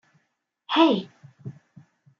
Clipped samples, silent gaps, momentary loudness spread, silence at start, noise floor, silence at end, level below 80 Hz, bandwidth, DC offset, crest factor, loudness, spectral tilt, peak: under 0.1%; none; 23 LU; 0.7 s; -75 dBFS; 0.7 s; -80 dBFS; 6.8 kHz; under 0.1%; 22 dB; -22 LUFS; -6.5 dB/octave; -6 dBFS